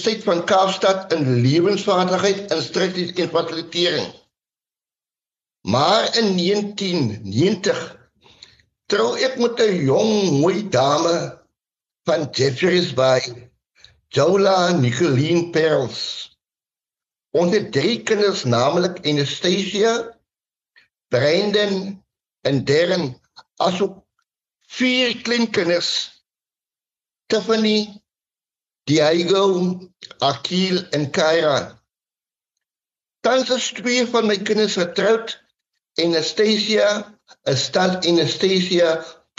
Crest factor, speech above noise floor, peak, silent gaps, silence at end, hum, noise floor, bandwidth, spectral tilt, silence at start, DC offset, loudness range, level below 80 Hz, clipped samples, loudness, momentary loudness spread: 16 dB; over 72 dB; -4 dBFS; none; 0.25 s; none; under -90 dBFS; 8 kHz; -4.5 dB/octave; 0 s; under 0.1%; 3 LU; -64 dBFS; under 0.1%; -19 LUFS; 9 LU